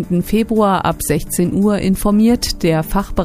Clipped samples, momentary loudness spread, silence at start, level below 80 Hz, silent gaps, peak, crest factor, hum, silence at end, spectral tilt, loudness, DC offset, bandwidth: under 0.1%; 5 LU; 0 s; -30 dBFS; none; 0 dBFS; 14 dB; none; 0 s; -5.5 dB/octave; -15 LUFS; under 0.1%; 15.5 kHz